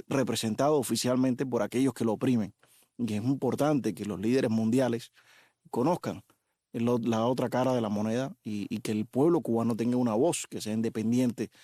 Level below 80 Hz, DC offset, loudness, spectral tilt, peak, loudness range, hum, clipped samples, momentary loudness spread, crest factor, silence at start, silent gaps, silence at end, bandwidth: -70 dBFS; under 0.1%; -29 LUFS; -6 dB/octave; -14 dBFS; 2 LU; none; under 0.1%; 8 LU; 16 dB; 0.1 s; none; 0.15 s; 14.5 kHz